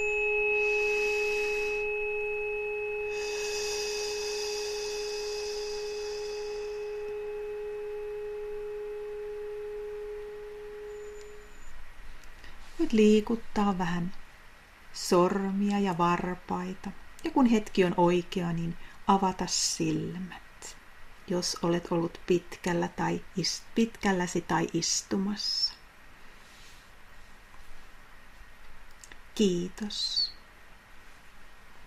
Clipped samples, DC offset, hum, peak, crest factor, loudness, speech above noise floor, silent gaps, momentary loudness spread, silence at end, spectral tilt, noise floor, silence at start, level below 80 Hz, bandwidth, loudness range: under 0.1%; under 0.1%; none; -10 dBFS; 22 dB; -30 LUFS; 24 dB; none; 17 LU; 0 s; -4 dB/octave; -52 dBFS; 0 s; -50 dBFS; 15.5 kHz; 10 LU